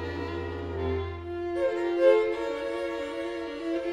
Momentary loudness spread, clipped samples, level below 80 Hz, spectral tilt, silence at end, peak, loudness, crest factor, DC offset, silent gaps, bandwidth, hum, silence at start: 12 LU; under 0.1%; -50 dBFS; -7 dB/octave; 0 s; -10 dBFS; -29 LUFS; 18 dB; under 0.1%; none; 10 kHz; none; 0 s